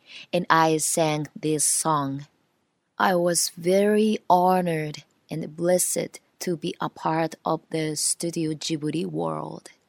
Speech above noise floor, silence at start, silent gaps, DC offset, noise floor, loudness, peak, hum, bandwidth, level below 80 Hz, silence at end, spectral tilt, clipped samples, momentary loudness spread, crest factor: 48 dB; 0.1 s; none; under 0.1%; -72 dBFS; -24 LUFS; 0 dBFS; none; 17 kHz; -70 dBFS; 0.3 s; -4 dB/octave; under 0.1%; 14 LU; 24 dB